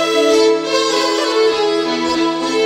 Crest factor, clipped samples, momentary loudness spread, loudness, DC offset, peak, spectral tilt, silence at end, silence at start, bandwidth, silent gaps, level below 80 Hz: 12 dB; under 0.1%; 4 LU; -15 LUFS; under 0.1%; -2 dBFS; -2.5 dB/octave; 0 s; 0 s; 15.5 kHz; none; -54 dBFS